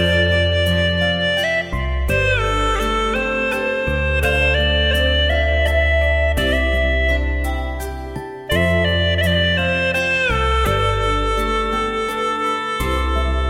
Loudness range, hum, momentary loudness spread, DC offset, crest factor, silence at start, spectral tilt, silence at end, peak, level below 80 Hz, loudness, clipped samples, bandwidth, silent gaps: 2 LU; none; 5 LU; under 0.1%; 14 dB; 0 s; -5 dB/octave; 0 s; -4 dBFS; -24 dBFS; -18 LUFS; under 0.1%; 16 kHz; none